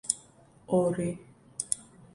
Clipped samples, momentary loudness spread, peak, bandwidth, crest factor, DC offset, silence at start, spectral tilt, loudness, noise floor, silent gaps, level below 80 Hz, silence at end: under 0.1%; 14 LU; -6 dBFS; 11.5 kHz; 26 dB; under 0.1%; 0.05 s; -5 dB/octave; -31 LUFS; -57 dBFS; none; -64 dBFS; 0.1 s